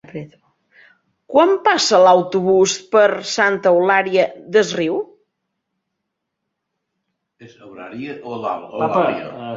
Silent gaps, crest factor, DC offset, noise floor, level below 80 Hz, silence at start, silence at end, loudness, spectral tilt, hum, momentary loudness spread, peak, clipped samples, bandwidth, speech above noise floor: none; 16 dB; under 0.1%; -77 dBFS; -64 dBFS; 0.15 s; 0 s; -16 LUFS; -3.5 dB/octave; none; 17 LU; -2 dBFS; under 0.1%; 7.8 kHz; 61 dB